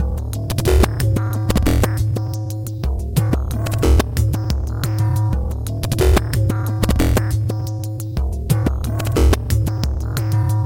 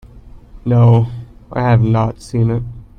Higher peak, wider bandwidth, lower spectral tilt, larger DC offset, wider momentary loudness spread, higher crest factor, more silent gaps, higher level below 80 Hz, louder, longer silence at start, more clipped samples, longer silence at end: about the same, 0 dBFS vs 0 dBFS; first, 17 kHz vs 8.8 kHz; second, -6.5 dB/octave vs -9 dB/octave; neither; second, 8 LU vs 15 LU; about the same, 16 dB vs 14 dB; neither; first, -22 dBFS vs -36 dBFS; second, -19 LUFS vs -15 LUFS; second, 0 s vs 0.15 s; neither; second, 0 s vs 0.15 s